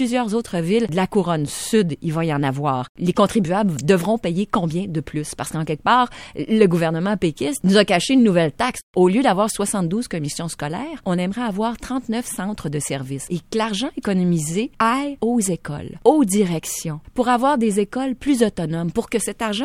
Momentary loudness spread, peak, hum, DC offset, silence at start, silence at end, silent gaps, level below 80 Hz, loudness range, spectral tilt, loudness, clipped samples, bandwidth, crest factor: 10 LU; 0 dBFS; none; under 0.1%; 0 s; 0 s; 2.89-2.95 s, 8.83-8.94 s; -48 dBFS; 6 LU; -5.5 dB/octave; -20 LUFS; under 0.1%; 16 kHz; 20 dB